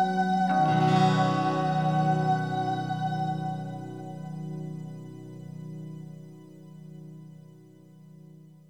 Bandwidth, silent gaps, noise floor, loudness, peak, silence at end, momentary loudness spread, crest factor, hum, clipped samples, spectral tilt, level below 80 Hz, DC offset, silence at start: 9.6 kHz; none; -52 dBFS; -27 LUFS; -10 dBFS; 0.2 s; 23 LU; 18 dB; none; under 0.1%; -7 dB/octave; -70 dBFS; 0.1%; 0 s